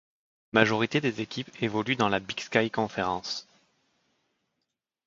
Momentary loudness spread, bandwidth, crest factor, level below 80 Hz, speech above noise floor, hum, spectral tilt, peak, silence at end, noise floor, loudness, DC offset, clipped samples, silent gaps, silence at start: 10 LU; 7.6 kHz; 28 dB; -64 dBFS; 56 dB; none; -5 dB/octave; -2 dBFS; 1.65 s; -83 dBFS; -28 LUFS; under 0.1%; under 0.1%; none; 0.55 s